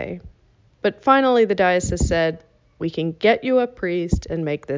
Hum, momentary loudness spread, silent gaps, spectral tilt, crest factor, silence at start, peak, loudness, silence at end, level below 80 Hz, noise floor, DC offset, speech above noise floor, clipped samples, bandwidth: none; 12 LU; none; -5.5 dB/octave; 18 dB; 0 s; -2 dBFS; -20 LUFS; 0 s; -36 dBFS; -57 dBFS; under 0.1%; 37 dB; under 0.1%; 7.6 kHz